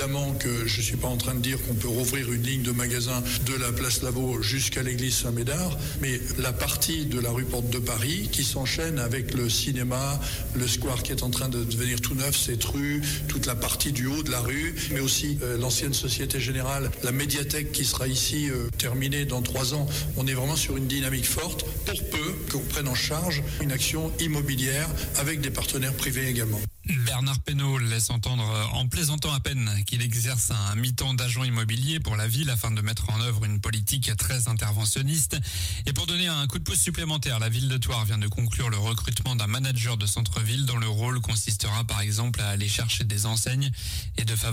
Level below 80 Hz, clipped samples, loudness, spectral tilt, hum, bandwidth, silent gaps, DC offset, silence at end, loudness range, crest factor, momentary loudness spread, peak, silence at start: -38 dBFS; under 0.1%; -26 LUFS; -3.5 dB/octave; none; 16.5 kHz; none; under 0.1%; 0 s; 1 LU; 14 dB; 3 LU; -12 dBFS; 0 s